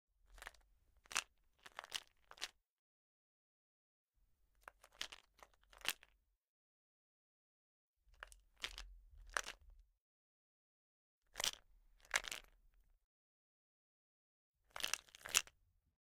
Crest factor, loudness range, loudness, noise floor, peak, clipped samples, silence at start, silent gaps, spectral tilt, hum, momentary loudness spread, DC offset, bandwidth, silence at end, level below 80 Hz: 44 dB; 10 LU; -44 LUFS; -78 dBFS; -8 dBFS; under 0.1%; 0.3 s; 2.70-4.07 s, 6.37-6.41 s, 6.48-7.94 s, 10.01-11.22 s, 13.04-14.54 s; 1.5 dB/octave; none; 22 LU; under 0.1%; 16.5 kHz; 0.55 s; -70 dBFS